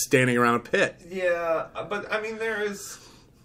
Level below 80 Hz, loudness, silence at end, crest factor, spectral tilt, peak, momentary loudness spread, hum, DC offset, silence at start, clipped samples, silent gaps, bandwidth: -60 dBFS; -25 LUFS; 0.35 s; 18 dB; -4.5 dB/octave; -8 dBFS; 12 LU; none; under 0.1%; 0 s; under 0.1%; none; 16 kHz